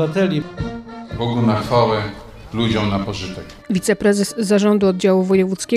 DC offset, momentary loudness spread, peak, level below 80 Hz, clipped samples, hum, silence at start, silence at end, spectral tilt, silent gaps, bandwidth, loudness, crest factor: under 0.1%; 14 LU; -2 dBFS; -42 dBFS; under 0.1%; none; 0 s; 0 s; -6 dB/octave; none; 13.5 kHz; -18 LUFS; 16 dB